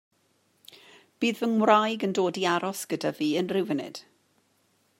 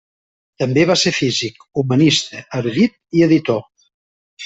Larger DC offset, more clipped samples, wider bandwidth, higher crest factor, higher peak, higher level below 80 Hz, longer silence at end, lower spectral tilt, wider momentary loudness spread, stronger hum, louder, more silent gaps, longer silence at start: neither; neither; first, 16 kHz vs 8.4 kHz; first, 22 dB vs 16 dB; second, -6 dBFS vs -2 dBFS; second, -80 dBFS vs -54 dBFS; first, 1 s vs 0 s; about the same, -4.5 dB/octave vs -5 dB/octave; about the same, 10 LU vs 10 LU; neither; second, -26 LUFS vs -16 LUFS; second, none vs 3.94-4.37 s; first, 1.2 s vs 0.6 s